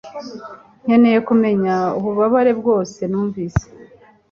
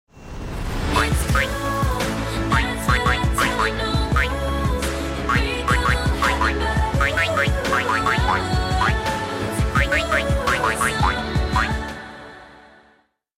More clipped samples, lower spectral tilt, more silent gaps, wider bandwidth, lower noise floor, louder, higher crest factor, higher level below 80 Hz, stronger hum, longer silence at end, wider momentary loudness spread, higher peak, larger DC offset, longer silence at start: neither; first, -7.5 dB/octave vs -4.5 dB/octave; neither; second, 7 kHz vs 16 kHz; second, -46 dBFS vs -60 dBFS; first, -17 LUFS vs -20 LUFS; about the same, 14 dB vs 16 dB; second, -42 dBFS vs -28 dBFS; neither; second, 0.5 s vs 0.8 s; first, 19 LU vs 6 LU; first, -2 dBFS vs -6 dBFS; neither; about the same, 0.05 s vs 0.15 s